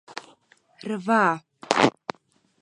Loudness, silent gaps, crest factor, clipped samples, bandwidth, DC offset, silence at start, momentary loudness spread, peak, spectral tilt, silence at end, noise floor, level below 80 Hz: -23 LUFS; none; 24 dB; under 0.1%; 11 kHz; under 0.1%; 0.1 s; 19 LU; -2 dBFS; -4.5 dB/octave; 0.7 s; -64 dBFS; -72 dBFS